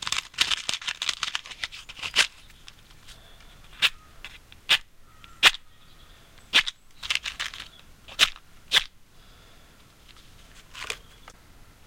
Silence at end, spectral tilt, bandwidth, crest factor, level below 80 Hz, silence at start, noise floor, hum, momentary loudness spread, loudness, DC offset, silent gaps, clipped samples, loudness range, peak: 0.55 s; 1 dB/octave; 17 kHz; 30 dB; -52 dBFS; 0 s; -53 dBFS; none; 21 LU; -25 LUFS; under 0.1%; none; under 0.1%; 5 LU; 0 dBFS